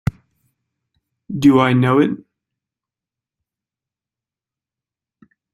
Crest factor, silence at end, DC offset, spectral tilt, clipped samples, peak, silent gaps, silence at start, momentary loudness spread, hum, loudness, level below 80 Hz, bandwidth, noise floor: 20 dB; 3.35 s; under 0.1%; -7.5 dB/octave; under 0.1%; -2 dBFS; none; 0.05 s; 17 LU; none; -15 LUFS; -52 dBFS; 12.5 kHz; -89 dBFS